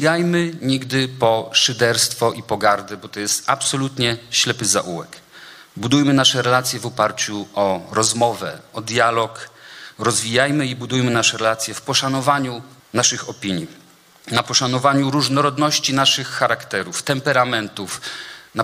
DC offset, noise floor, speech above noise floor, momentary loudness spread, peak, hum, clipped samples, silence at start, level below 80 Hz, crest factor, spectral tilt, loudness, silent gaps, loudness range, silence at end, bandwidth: under 0.1%; -42 dBFS; 23 dB; 13 LU; -2 dBFS; none; under 0.1%; 0 s; -58 dBFS; 18 dB; -3 dB/octave; -18 LUFS; none; 2 LU; 0 s; 16 kHz